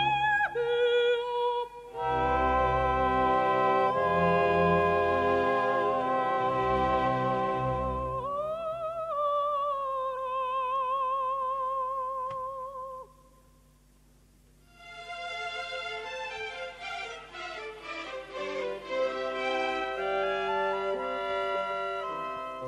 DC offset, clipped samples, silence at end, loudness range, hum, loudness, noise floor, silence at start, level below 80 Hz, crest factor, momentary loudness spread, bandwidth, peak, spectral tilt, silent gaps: under 0.1%; under 0.1%; 0 s; 13 LU; none; -29 LUFS; -60 dBFS; 0 s; -50 dBFS; 18 dB; 13 LU; 11.5 kHz; -12 dBFS; -6 dB/octave; none